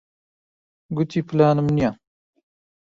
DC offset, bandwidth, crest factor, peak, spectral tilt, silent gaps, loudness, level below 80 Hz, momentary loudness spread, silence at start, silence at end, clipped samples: under 0.1%; 7.4 kHz; 20 dB; -4 dBFS; -8.5 dB/octave; none; -21 LUFS; -52 dBFS; 9 LU; 0.9 s; 0.95 s; under 0.1%